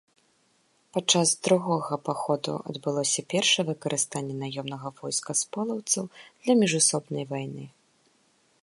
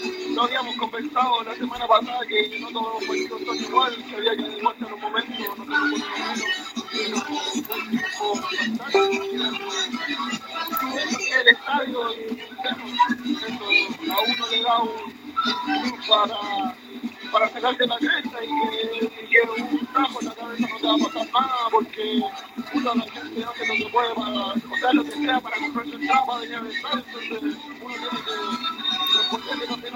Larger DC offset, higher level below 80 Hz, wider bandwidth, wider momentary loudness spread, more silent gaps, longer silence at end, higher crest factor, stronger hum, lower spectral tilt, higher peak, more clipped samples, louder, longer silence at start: neither; second, -74 dBFS vs -68 dBFS; second, 11.5 kHz vs 16.5 kHz; first, 12 LU vs 9 LU; neither; first, 0.95 s vs 0 s; about the same, 20 dB vs 24 dB; neither; about the same, -3 dB/octave vs -2.5 dB/octave; second, -8 dBFS vs 0 dBFS; neither; second, -26 LUFS vs -23 LUFS; first, 0.95 s vs 0 s